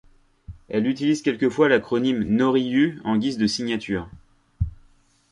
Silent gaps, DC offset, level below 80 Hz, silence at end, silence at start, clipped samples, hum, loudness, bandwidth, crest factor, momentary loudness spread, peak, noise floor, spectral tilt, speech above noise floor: none; under 0.1%; -44 dBFS; 0.55 s; 0.5 s; under 0.1%; none; -22 LUFS; 11.5 kHz; 18 dB; 12 LU; -6 dBFS; -57 dBFS; -6 dB/octave; 36 dB